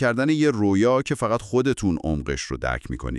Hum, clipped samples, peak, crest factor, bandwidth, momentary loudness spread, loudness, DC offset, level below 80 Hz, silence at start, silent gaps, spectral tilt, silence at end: none; under 0.1%; -8 dBFS; 14 dB; 12 kHz; 8 LU; -23 LUFS; under 0.1%; -38 dBFS; 0 s; none; -6 dB/octave; 0 s